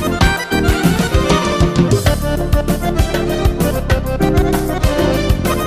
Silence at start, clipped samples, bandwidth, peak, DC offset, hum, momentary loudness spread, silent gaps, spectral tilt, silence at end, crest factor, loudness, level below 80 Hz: 0 s; under 0.1%; 15.5 kHz; -2 dBFS; under 0.1%; none; 3 LU; none; -5.5 dB/octave; 0 s; 12 dB; -15 LUFS; -20 dBFS